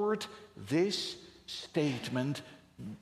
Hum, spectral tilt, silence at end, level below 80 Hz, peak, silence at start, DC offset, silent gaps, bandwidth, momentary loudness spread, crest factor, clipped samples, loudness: none; -5 dB/octave; 0 s; -72 dBFS; -16 dBFS; 0 s; under 0.1%; none; 14.5 kHz; 17 LU; 18 dB; under 0.1%; -35 LUFS